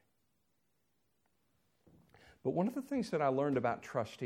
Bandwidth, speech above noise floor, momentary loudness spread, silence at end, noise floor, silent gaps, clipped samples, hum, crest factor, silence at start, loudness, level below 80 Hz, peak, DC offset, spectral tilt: 15.5 kHz; 46 dB; 6 LU; 0 s; -81 dBFS; none; under 0.1%; none; 20 dB; 2.45 s; -36 LUFS; -76 dBFS; -20 dBFS; under 0.1%; -7 dB/octave